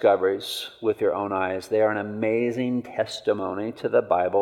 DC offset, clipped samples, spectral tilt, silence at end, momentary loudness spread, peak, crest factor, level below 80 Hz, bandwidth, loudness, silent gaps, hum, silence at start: under 0.1%; under 0.1%; -5.5 dB/octave; 0 s; 7 LU; -6 dBFS; 16 dB; -70 dBFS; 17 kHz; -25 LUFS; none; none; 0 s